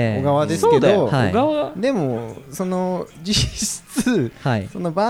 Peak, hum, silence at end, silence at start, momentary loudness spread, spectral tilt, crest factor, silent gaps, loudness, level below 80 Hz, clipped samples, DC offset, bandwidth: -4 dBFS; none; 0 s; 0 s; 9 LU; -5 dB/octave; 16 dB; none; -20 LUFS; -42 dBFS; under 0.1%; under 0.1%; 17 kHz